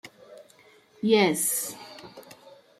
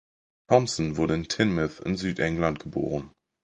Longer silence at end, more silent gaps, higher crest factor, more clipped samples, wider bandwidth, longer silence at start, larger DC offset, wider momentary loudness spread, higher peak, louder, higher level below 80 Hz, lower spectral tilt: first, 0.6 s vs 0.35 s; neither; about the same, 20 dB vs 22 dB; neither; first, 16 kHz vs 10 kHz; second, 0.05 s vs 0.5 s; neither; first, 25 LU vs 7 LU; second, -8 dBFS vs -4 dBFS; about the same, -24 LUFS vs -26 LUFS; second, -76 dBFS vs -48 dBFS; second, -3 dB/octave vs -5.5 dB/octave